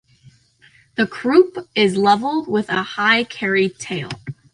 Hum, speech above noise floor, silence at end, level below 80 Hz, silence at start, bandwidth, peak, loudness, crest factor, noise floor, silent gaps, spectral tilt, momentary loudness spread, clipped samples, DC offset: none; 35 dB; 0.2 s; -60 dBFS; 1 s; 11 kHz; -2 dBFS; -18 LUFS; 18 dB; -53 dBFS; none; -5 dB/octave; 12 LU; under 0.1%; under 0.1%